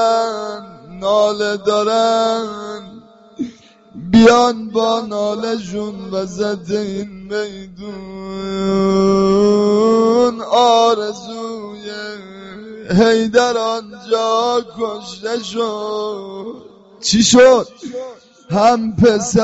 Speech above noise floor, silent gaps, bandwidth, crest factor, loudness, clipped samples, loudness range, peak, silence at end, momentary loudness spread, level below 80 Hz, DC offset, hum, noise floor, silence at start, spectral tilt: 26 dB; none; 8 kHz; 16 dB; -15 LUFS; under 0.1%; 7 LU; 0 dBFS; 0 s; 19 LU; -46 dBFS; under 0.1%; none; -41 dBFS; 0 s; -4 dB/octave